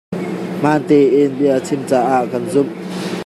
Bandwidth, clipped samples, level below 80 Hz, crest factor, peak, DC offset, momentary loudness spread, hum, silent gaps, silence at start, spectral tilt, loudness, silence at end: 13.5 kHz; under 0.1%; -62 dBFS; 14 dB; -2 dBFS; under 0.1%; 11 LU; none; none; 0.1 s; -6.5 dB/octave; -16 LUFS; 0 s